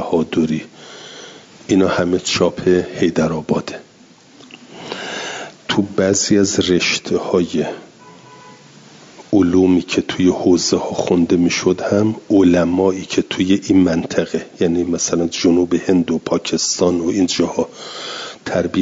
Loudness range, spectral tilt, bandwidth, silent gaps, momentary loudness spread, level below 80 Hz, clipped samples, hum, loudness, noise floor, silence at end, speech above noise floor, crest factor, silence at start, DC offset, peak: 4 LU; -4.5 dB/octave; 7.8 kHz; none; 13 LU; -54 dBFS; under 0.1%; none; -17 LUFS; -46 dBFS; 0 s; 30 dB; 14 dB; 0 s; under 0.1%; -2 dBFS